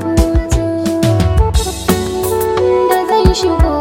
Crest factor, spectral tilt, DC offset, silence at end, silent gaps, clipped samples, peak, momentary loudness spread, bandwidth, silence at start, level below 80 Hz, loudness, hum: 12 dB; -6 dB/octave; under 0.1%; 0 s; none; under 0.1%; 0 dBFS; 4 LU; 17 kHz; 0 s; -18 dBFS; -14 LUFS; none